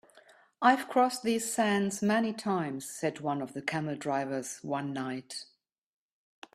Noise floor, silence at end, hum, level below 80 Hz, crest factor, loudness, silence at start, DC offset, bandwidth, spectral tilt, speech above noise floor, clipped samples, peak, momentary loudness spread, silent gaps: -60 dBFS; 1.1 s; none; -76 dBFS; 22 dB; -31 LUFS; 0.15 s; under 0.1%; 14.5 kHz; -4.5 dB/octave; 30 dB; under 0.1%; -8 dBFS; 10 LU; none